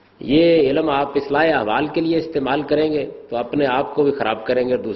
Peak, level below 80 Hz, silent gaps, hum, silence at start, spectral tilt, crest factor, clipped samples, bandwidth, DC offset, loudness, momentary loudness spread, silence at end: -4 dBFS; -50 dBFS; none; none; 0.2 s; -8.5 dB/octave; 14 dB; under 0.1%; 6 kHz; under 0.1%; -19 LUFS; 7 LU; 0 s